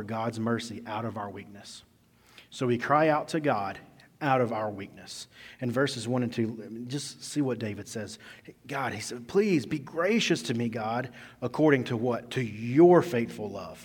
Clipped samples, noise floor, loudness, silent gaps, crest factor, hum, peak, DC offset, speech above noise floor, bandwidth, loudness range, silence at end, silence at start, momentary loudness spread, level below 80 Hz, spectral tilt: under 0.1%; -58 dBFS; -28 LUFS; none; 22 dB; none; -8 dBFS; under 0.1%; 30 dB; 17.5 kHz; 6 LU; 0 s; 0 s; 18 LU; -68 dBFS; -5.5 dB/octave